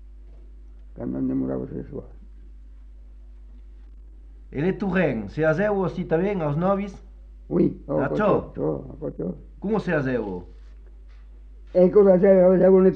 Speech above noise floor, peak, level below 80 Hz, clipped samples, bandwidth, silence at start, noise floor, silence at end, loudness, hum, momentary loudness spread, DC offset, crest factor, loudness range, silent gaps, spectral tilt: 23 dB; -6 dBFS; -42 dBFS; under 0.1%; 6.2 kHz; 0 s; -44 dBFS; 0 s; -22 LUFS; none; 18 LU; under 0.1%; 18 dB; 11 LU; none; -10 dB/octave